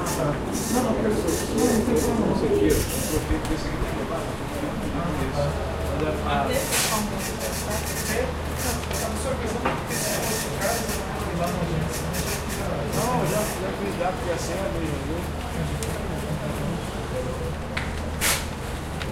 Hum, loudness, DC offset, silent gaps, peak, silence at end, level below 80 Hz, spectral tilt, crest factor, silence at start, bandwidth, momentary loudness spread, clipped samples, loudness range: none; -26 LUFS; under 0.1%; none; -8 dBFS; 0 s; -34 dBFS; -4.5 dB/octave; 18 dB; 0 s; 16 kHz; 7 LU; under 0.1%; 5 LU